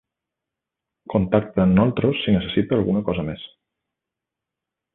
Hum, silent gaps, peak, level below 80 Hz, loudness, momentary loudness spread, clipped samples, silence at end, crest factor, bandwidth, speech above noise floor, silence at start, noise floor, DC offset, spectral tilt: none; none; -4 dBFS; -44 dBFS; -21 LUFS; 11 LU; under 0.1%; 1.5 s; 20 dB; 4 kHz; 66 dB; 1.1 s; -85 dBFS; under 0.1%; -12 dB/octave